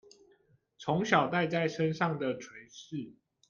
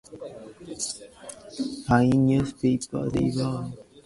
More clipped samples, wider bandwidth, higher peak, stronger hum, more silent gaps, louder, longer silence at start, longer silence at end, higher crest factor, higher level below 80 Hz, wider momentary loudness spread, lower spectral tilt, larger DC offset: neither; second, 7.4 kHz vs 11.5 kHz; second, -10 dBFS vs -6 dBFS; neither; neither; second, -31 LUFS vs -25 LUFS; first, 0.8 s vs 0.1 s; first, 0.35 s vs 0.05 s; about the same, 22 dB vs 20 dB; second, -72 dBFS vs -50 dBFS; second, 18 LU vs 21 LU; about the same, -6 dB/octave vs -6 dB/octave; neither